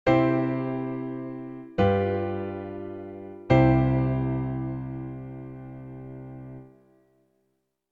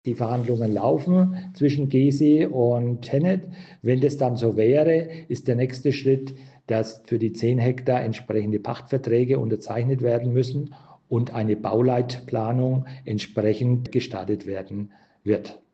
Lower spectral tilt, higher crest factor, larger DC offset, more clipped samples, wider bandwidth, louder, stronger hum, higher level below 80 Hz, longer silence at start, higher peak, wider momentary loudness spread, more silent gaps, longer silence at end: about the same, -9.5 dB/octave vs -8.5 dB/octave; first, 22 dB vs 14 dB; neither; neither; second, 4.7 kHz vs 8 kHz; second, -26 LUFS vs -23 LUFS; neither; first, -44 dBFS vs -64 dBFS; about the same, 0.05 s vs 0.05 s; about the same, -6 dBFS vs -8 dBFS; first, 20 LU vs 10 LU; neither; first, 1.2 s vs 0.15 s